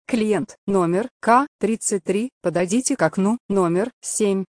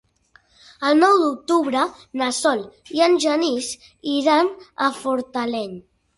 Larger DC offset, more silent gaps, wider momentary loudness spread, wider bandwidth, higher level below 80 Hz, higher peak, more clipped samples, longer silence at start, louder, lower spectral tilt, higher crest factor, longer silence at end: neither; first, 0.58-0.67 s, 1.11-1.20 s, 1.48-1.59 s, 2.32-2.41 s, 3.40-3.49 s, 3.93-4.02 s vs none; second, 6 LU vs 12 LU; about the same, 11 kHz vs 11.5 kHz; first, -58 dBFS vs -64 dBFS; about the same, -2 dBFS vs -4 dBFS; neither; second, 0.1 s vs 0.8 s; about the same, -21 LUFS vs -20 LUFS; first, -5 dB/octave vs -3 dB/octave; about the same, 18 dB vs 18 dB; second, 0.05 s vs 0.4 s